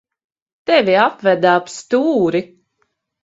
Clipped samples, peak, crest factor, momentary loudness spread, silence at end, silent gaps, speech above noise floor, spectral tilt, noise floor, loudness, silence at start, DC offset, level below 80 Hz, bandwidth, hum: under 0.1%; 0 dBFS; 16 dB; 7 LU; 0.8 s; none; 53 dB; -5 dB/octave; -68 dBFS; -15 LUFS; 0.7 s; under 0.1%; -64 dBFS; 8 kHz; none